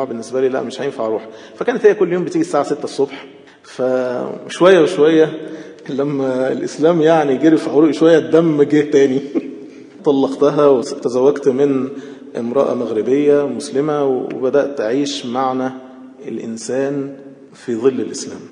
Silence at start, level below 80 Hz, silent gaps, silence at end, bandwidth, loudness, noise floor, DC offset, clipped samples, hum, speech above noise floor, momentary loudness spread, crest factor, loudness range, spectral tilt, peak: 0 s; -72 dBFS; none; 0.05 s; 10.5 kHz; -16 LUFS; -35 dBFS; under 0.1%; under 0.1%; none; 20 dB; 15 LU; 16 dB; 6 LU; -6 dB/octave; 0 dBFS